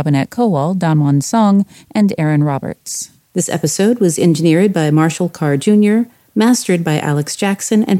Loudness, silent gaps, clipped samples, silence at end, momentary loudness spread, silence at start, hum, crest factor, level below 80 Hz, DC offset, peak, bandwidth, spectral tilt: -14 LUFS; none; under 0.1%; 0 s; 8 LU; 0 s; none; 12 dB; -58 dBFS; under 0.1%; 0 dBFS; 16 kHz; -6 dB/octave